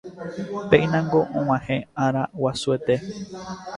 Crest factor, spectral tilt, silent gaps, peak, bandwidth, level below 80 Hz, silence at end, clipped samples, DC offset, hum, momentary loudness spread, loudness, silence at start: 22 dB; -6.5 dB/octave; none; -2 dBFS; 11 kHz; -52 dBFS; 0 s; under 0.1%; under 0.1%; none; 15 LU; -23 LUFS; 0.05 s